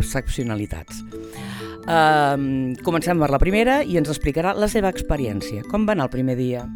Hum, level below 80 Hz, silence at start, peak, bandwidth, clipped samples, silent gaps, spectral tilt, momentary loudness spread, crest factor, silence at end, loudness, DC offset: none; -32 dBFS; 0 s; -4 dBFS; 19.5 kHz; under 0.1%; none; -6 dB/octave; 15 LU; 18 dB; 0 s; -21 LUFS; under 0.1%